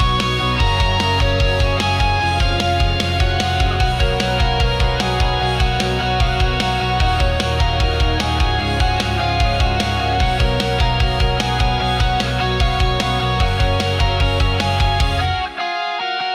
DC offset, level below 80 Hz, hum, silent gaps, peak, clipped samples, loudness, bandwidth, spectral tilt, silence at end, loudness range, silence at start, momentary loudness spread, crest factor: under 0.1%; -22 dBFS; none; none; -4 dBFS; under 0.1%; -17 LUFS; 14 kHz; -5 dB/octave; 0 s; 1 LU; 0 s; 2 LU; 12 dB